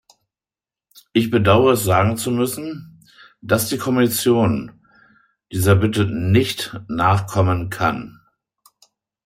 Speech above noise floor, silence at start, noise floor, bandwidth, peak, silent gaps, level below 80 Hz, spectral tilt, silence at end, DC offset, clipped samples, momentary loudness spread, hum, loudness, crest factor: over 72 dB; 1.15 s; under -90 dBFS; 16 kHz; -2 dBFS; none; -52 dBFS; -5.5 dB/octave; 1.15 s; under 0.1%; under 0.1%; 14 LU; none; -18 LUFS; 18 dB